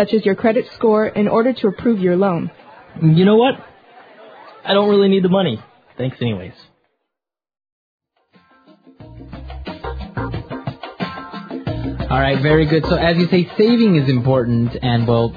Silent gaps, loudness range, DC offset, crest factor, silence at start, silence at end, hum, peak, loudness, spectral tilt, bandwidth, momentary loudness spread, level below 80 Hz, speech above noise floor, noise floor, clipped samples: 7.72-7.99 s; 16 LU; under 0.1%; 18 dB; 0 s; 0 s; none; 0 dBFS; -16 LUFS; -9.5 dB/octave; 5 kHz; 16 LU; -38 dBFS; 70 dB; -85 dBFS; under 0.1%